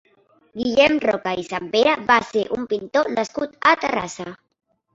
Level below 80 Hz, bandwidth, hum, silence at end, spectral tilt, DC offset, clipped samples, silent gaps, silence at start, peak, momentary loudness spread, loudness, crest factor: -56 dBFS; 8 kHz; none; 0.6 s; -4 dB/octave; under 0.1%; under 0.1%; none; 0.55 s; 0 dBFS; 11 LU; -20 LUFS; 20 dB